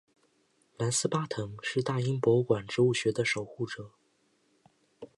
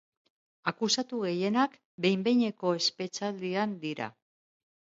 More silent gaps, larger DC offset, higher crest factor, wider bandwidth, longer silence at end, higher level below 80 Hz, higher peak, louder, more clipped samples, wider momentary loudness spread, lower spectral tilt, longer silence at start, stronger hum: second, none vs 1.85-1.98 s; neither; about the same, 20 dB vs 18 dB; first, 11.5 kHz vs 7.8 kHz; second, 0.1 s vs 0.85 s; first, -68 dBFS vs -78 dBFS; about the same, -12 dBFS vs -12 dBFS; about the same, -30 LUFS vs -30 LUFS; neither; about the same, 11 LU vs 9 LU; about the same, -5 dB/octave vs -4 dB/octave; first, 0.8 s vs 0.65 s; neither